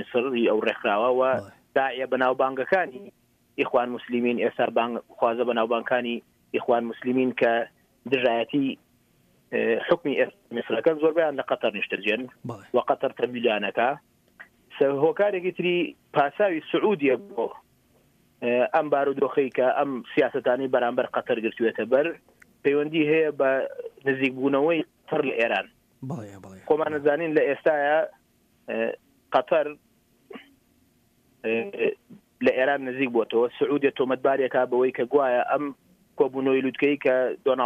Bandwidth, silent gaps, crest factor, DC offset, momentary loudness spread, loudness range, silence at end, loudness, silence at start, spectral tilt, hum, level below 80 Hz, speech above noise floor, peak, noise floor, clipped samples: 8 kHz; none; 16 dB; under 0.1%; 9 LU; 3 LU; 0 s; -25 LUFS; 0 s; -7 dB/octave; none; -72 dBFS; 40 dB; -8 dBFS; -64 dBFS; under 0.1%